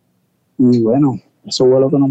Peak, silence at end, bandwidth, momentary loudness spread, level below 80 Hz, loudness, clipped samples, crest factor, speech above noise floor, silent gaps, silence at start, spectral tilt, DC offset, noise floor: -4 dBFS; 0 s; 9 kHz; 9 LU; -58 dBFS; -14 LUFS; under 0.1%; 10 dB; 50 dB; none; 0.6 s; -7.5 dB/octave; under 0.1%; -62 dBFS